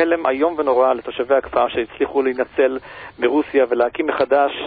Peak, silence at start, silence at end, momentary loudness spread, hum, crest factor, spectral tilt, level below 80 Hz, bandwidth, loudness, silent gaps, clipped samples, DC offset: -4 dBFS; 0 s; 0 s; 5 LU; none; 16 dB; -9.5 dB/octave; -52 dBFS; 4.8 kHz; -19 LUFS; none; under 0.1%; under 0.1%